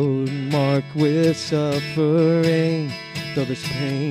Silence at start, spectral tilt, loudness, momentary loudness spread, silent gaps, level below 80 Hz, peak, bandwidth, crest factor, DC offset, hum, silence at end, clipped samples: 0 s; -6.5 dB/octave; -21 LUFS; 8 LU; none; -60 dBFS; -6 dBFS; 15.5 kHz; 14 dB; under 0.1%; none; 0 s; under 0.1%